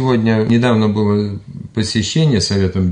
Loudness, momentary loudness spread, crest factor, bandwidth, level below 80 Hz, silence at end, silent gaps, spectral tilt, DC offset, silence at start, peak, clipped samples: -15 LUFS; 9 LU; 12 dB; 10.5 kHz; -46 dBFS; 0 s; none; -6 dB/octave; under 0.1%; 0 s; -4 dBFS; under 0.1%